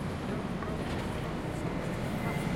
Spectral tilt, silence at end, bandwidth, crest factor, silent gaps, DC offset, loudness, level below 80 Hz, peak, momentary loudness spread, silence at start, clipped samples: -6.5 dB/octave; 0 s; 16.5 kHz; 14 dB; none; under 0.1%; -35 LUFS; -46 dBFS; -20 dBFS; 2 LU; 0 s; under 0.1%